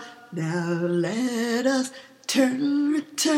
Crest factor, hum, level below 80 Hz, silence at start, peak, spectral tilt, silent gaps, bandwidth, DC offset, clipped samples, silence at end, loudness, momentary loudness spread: 16 dB; none; -76 dBFS; 0 s; -8 dBFS; -4.5 dB/octave; none; 16.5 kHz; under 0.1%; under 0.1%; 0 s; -25 LUFS; 9 LU